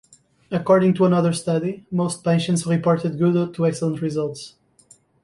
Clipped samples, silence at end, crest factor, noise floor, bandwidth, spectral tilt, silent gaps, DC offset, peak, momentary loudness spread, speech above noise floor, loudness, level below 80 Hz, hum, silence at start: under 0.1%; 0.75 s; 16 dB; -55 dBFS; 11.5 kHz; -6.5 dB/octave; none; under 0.1%; -4 dBFS; 10 LU; 35 dB; -21 LUFS; -60 dBFS; none; 0.5 s